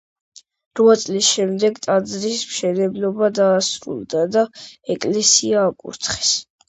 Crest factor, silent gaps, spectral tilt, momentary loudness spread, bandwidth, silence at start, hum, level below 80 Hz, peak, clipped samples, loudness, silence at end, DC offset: 18 dB; none; -3 dB/octave; 10 LU; 8.8 kHz; 0.75 s; none; -58 dBFS; 0 dBFS; under 0.1%; -18 LUFS; 0.25 s; under 0.1%